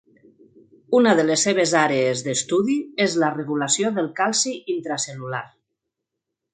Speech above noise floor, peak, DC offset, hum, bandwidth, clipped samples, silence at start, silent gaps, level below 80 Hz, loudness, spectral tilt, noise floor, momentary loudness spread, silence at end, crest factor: 61 dB; -2 dBFS; under 0.1%; none; 9.6 kHz; under 0.1%; 0.9 s; none; -70 dBFS; -21 LUFS; -3.5 dB/octave; -82 dBFS; 10 LU; 1.05 s; 20 dB